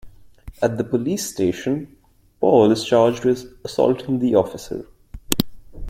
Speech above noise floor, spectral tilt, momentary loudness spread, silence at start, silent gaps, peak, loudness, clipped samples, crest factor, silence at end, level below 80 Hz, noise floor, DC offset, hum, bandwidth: 22 dB; -5.5 dB/octave; 13 LU; 0.05 s; none; 0 dBFS; -20 LUFS; under 0.1%; 20 dB; 0 s; -44 dBFS; -41 dBFS; under 0.1%; none; 16.5 kHz